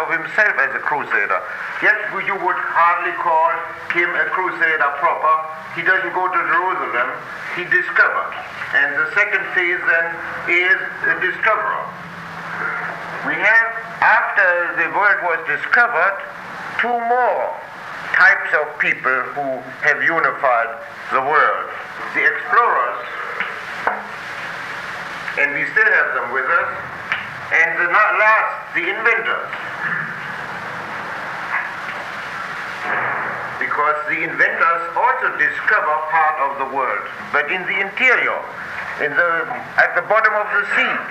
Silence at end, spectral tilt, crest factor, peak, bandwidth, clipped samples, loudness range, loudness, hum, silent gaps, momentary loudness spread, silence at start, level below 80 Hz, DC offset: 0 s; -4 dB/octave; 18 dB; -2 dBFS; 15.5 kHz; under 0.1%; 4 LU; -17 LUFS; none; none; 12 LU; 0 s; -62 dBFS; under 0.1%